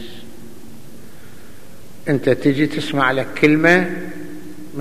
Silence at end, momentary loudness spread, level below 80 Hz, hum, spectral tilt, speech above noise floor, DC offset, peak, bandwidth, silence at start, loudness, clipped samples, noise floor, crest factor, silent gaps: 0 s; 21 LU; -54 dBFS; none; -6 dB/octave; 26 dB; 3%; 0 dBFS; 15 kHz; 0 s; -17 LUFS; under 0.1%; -42 dBFS; 20 dB; none